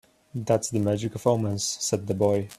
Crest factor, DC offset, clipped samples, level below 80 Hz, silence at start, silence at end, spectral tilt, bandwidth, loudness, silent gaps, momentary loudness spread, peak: 18 dB; under 0.1%; under 0.1%; -60 dBFS; 0.35 s; 0.05 s; -5 dB/octave; 14.5 kHz; -26 LUFS; none; 3 LU; -8 dBFS